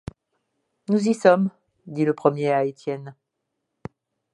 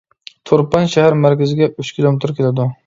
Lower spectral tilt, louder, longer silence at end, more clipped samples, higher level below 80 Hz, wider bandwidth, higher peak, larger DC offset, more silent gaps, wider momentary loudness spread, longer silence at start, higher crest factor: about the same, -7 dB/octave vs -7 dB/octave; second, -22 LUFS vs -15 LUFS; first, 1.2 s vs 0.1 s; neither; second, -60 dBFS vs -50 dBFS; first, 11.5 kHz vs 7.6 kHz; about the same, -2 dBFS vs 0 dBFS; neither; neither; first, 24 LU vs 5 LU; first, 0.9 s vs 0.45 s; first, 22 dB vs 14 dB